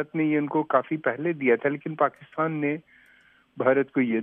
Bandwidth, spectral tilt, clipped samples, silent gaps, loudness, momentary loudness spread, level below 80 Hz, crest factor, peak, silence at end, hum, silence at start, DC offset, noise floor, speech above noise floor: 3.7 kHz; -10 dB/octave; under 0.1%; none; -25 LUFS; 5 LU; -78 dBFS; 20 dB; -6 dBFS; 0 s; none; 0 s; under 0.1%; -59 dBFS; 34 dB